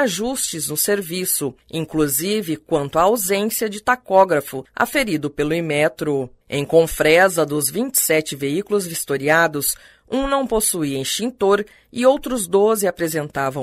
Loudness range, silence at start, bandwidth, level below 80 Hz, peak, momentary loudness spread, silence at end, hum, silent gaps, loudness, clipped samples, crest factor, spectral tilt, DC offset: 2 LU; 0 s; 16 kHz; -46 dBFS; -2 dBFS; 8 LU; 0 s; none; none; -19 LUFS; under 0.1%; 16 dB; -3.5 dB/octave; under 0.1%